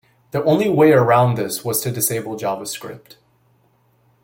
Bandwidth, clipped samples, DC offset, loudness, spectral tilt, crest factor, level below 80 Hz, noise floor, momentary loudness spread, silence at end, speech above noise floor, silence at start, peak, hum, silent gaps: 17 kHz; under 0.1%; under 0.1%; -18 LUFS; -5.5 dB/octave; 16 dB; -58 dBFS; -59 dBFS; 14 LU; 1.25 s; 42 dB; 0.35 s; -2 dBFS; none; none